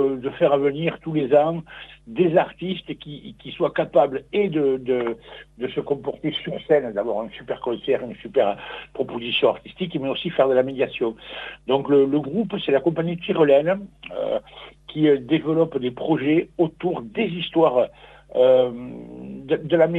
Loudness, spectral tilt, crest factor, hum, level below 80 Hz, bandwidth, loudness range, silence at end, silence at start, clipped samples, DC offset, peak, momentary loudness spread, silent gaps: -22 LUFS; -8.5 dB/octave; 18 dB; none; -56 dBFS; 4.2 kHz; 3 LU; 0 s; 0 s; under 0.1%; under 0.1%; -4 dBFS; 16 LU; none